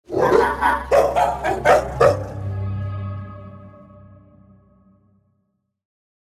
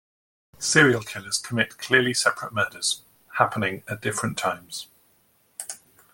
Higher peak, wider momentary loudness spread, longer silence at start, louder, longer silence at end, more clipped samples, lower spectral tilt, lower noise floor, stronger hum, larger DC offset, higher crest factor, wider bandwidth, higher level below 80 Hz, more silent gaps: about the same, 0 dBFS vs -2 dBFS; about the same, 16 LU vs 18 LU; second, 0.1 s vs 0.6 s; first, -19 LUFS vs -23 LUFS; first, 2.45 s vs 0.35 s; neither; first, -6 dB/octave vs -3 dB/octave; first, -71 dBFS vs -63 dBFS; neither; neither; about the same, 20 dB vs 24 dB; about the same, 16 kHz vs 17 kHz; first, -40 dBFS vs -62 dBFS; neither